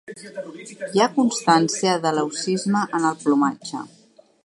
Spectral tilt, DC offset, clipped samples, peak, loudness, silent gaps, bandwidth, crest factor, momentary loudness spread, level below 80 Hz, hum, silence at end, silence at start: -4.5 dB/octave; under 0.1%; under 0.1%; -2 dBFS; -21 LUFS; none; 11.5 kHz; 20 dB; 17 LU; -72 dBFS; none; 0.6 s; 0.1 s